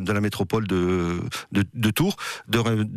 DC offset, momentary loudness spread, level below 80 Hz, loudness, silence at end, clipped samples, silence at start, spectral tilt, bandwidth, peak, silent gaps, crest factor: under 0.1%; 5 LU; -52 dBFS; -24 LUFS; 0 s; under 0.1%; 0 s; -5.5 dB/octave; 15 kHz; -8 dBFS; none; 14 dB